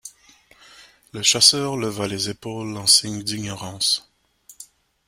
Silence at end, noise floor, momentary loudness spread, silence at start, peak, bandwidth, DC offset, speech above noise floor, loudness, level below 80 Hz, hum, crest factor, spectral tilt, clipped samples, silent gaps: 0.45 s; -54 dBFS; 16 LU; 0.05 s; 0 dBFS; 16 kHz; under 0.1%; 32 dB; -19 LUFS; -60 dBFS; none; 24 dB; -1.5 dB/octave; under 0.1%; none